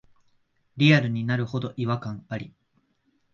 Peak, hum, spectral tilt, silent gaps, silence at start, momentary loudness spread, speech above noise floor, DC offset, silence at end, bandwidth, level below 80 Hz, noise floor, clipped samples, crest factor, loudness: -6 dBFS; none; -7 dB/octave; none; 0.75 s; 17 LU; 45 dB; under 0.1%; 0.85 s; 7.2 kHz; -64 dBFS; -69 dBFS; under 0.1%; 20 dB; -24 LUFS